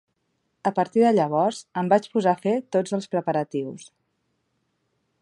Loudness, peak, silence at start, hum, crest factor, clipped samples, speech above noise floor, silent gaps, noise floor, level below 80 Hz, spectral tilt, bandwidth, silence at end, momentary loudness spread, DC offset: -23 LUFS; -6 dBFS; 0.65 s; none; 18 dB; under 0.1%; 51 dB; none; -74 dBFS; -74 dBFS; -6.5 dB/octave; 11.5 kHz; 1.35 s; 10 LU; under 0.1%